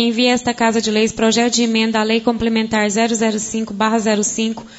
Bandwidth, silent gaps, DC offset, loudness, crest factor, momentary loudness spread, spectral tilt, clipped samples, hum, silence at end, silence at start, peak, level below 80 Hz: 8 kHz; none; under 0.1%; -16 LUFS; 14 dB; 4 LU; -3 dB/octave; under 0.1%; none; 0 s; 0 s; -2 dBFS; -48 dBFS